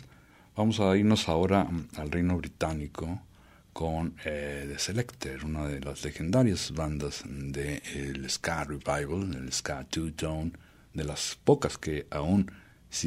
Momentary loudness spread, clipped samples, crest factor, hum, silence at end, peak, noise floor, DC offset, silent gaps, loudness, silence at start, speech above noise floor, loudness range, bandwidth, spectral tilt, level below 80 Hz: 11 LU; under 0.1%; 22 dB; none; 0 s; -8 dBFS; -57 dBFS; under 0.1%; none; -31 LUFS; 0 s; 27 dB; 6 LU; 15.5 kHz; -5 dB/octave; -46 dBFS